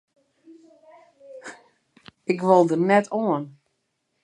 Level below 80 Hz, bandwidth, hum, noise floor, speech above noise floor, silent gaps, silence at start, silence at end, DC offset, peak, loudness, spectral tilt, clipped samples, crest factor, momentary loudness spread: -76 dBFS; 10.5 kHz; none; -75 dBFS; 55 dB; none; 1.3 s; 0.75 s; under 0.1%; -4 dBFS; -21 LUFS; -7 dB/octave; under 0.1%; 22 dB; 23 LU